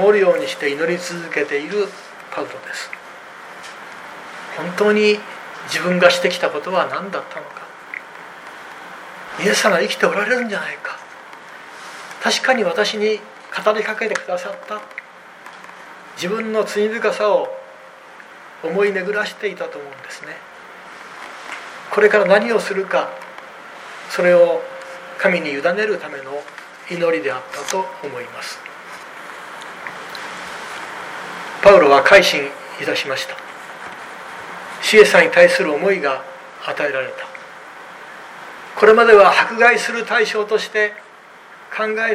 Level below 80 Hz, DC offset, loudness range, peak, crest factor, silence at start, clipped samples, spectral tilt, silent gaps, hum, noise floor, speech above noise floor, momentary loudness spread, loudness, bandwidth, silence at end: -60 dBFS; under 0.1%; 10 LU; 0 dBFS; 18 dB; 0 s; under 0.1%; -3.5 dB/octave; none; none; -42 dBFS; 25 dB; 23 LU; -16 LUFS; 15.5 kHz; 0 s